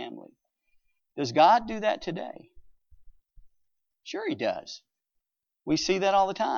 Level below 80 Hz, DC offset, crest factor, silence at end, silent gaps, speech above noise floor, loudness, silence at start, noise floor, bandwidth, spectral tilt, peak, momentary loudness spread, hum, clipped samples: -62 dBFS; under 0.1%; 22 dB; 0 s; none; 55 dB; -26 LUFS; 0 s; -82 dBFS; 7.2 kHz; -4 dB/octave; -8 dBFS; 23 LU; none; under 0.1%